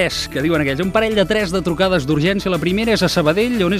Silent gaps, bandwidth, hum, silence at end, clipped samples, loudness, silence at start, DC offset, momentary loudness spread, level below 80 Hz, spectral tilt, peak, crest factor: none; 15.5 kHz; none; 0 s; under 0.1%; -17 LUFS; 0 s; under 0.1%; 3 LU; -36 dBFS; -5.5 dB/octave; -2 dBFS; 14 dB